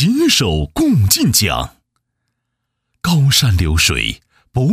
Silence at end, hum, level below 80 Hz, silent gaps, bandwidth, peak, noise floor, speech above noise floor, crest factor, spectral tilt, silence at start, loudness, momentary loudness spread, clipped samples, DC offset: 0 s; none; -30 dBFS; none; 16 kHz; 0 dBFS; -74 dBFS; 60 dB; 16 dB; -4 dB/octave; 0 s; -14 LUFS; 11 LU; under 0.1%; under 0.1%